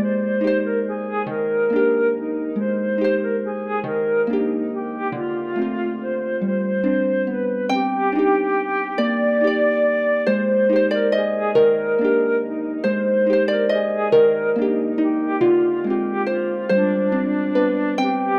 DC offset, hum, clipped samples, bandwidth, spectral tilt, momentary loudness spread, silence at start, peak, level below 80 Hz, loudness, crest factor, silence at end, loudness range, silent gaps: under 0.1%; none; under 0.1%; 6.8 kHz; -8 dB/octave; 7 LU; 0 s; -6 dBFS; -68 dBFS; -20 LUFS; 14 dB; 0 s; 4 LU; none